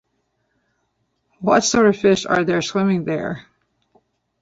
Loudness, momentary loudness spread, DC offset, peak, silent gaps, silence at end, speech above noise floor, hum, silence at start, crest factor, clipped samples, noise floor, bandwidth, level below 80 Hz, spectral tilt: -18 LUFS; 11 LU; under 0.1%; -2 dBFS; none; 1 s; 52 dB; none; 1.4 s; 20 dB; under 0.1%; -70 dBFS; 8 kHz; -54 dBFS; -4.5 dB/octave